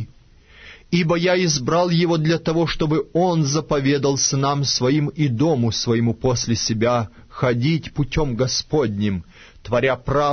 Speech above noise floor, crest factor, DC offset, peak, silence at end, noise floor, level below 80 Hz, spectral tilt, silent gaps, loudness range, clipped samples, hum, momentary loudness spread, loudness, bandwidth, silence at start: 29 dB; 14 dB; under 0.1%; -6 dBFS; 0 s; -49 dBFS; -40 dBFS; -5 dB/octave; none; 3 LU; under 0.1%; none; 5 LU; -20 LUFS; 6.6 kHz; 0 s